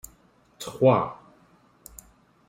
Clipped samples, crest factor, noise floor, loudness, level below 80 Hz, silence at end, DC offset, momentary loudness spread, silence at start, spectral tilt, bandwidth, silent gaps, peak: under 0.1%; 22 dB; -60 dBFS; -23 LUFS; -60 dBFS; 1.35 s; under 0.1%; 26 LU; 0.6 s; -6.5 dB/octave; 16 kHz; none; -6 dBFS